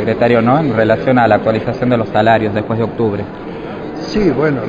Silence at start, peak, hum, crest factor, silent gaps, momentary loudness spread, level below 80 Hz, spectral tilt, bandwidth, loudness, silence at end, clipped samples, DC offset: 0 s; 0 dBFS; none; 14 dB; none; 14 LU; -40 dBFS; -8 dB/octave; 7.6 kHz; -14 LUFS; 0 s; under 0.1%; under 0.1%